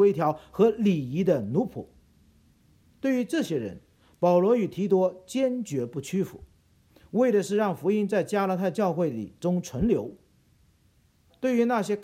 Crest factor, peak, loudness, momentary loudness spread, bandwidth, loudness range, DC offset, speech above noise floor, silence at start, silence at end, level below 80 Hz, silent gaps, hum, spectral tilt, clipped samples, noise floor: 18 dB; -10 dBFS; -26 LUFS; 9 LU; 15.5 kHz; 3 LU; under 0.1%; 38 dB; 0 s; 0 s; -56 dBFS; none; none; -7 dB/octave; under 0.1%; -64 dBFS